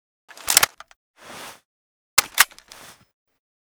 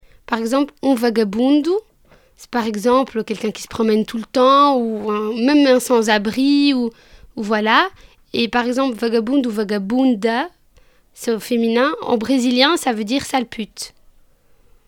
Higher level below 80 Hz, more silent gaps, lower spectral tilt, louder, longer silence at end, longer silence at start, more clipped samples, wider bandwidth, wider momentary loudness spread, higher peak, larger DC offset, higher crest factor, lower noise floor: second, -60 dBFS vs -52 dBFS; first, 0.96-1.14 s, 1.65-2.17 s vs none; second, 2 dB/octave vs -4 dB/octave; about the same, -18 LUFS vs -17 LUFS; first, 1.3 s vs 1 s; first, 0.45 s vs 0.3 s; neither; first, over 20 kHz vs 17 kHz; first, 23 LU vs 11 LU; about the same, 0 dBFS vs 0 dBFS; neither; first, 26 dB vs 18 dB; second, -47 dBFS vs -52 dBFS